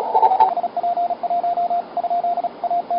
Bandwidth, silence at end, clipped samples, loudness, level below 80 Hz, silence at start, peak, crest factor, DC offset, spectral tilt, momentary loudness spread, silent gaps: 5.4 kHz; 0 s; under 0.1%; -20 LUFS; -66 dBFS; 0 s; -2 dBFS; 18 dB; under 0.1%; -8.5 dB/octave; 7 LU; none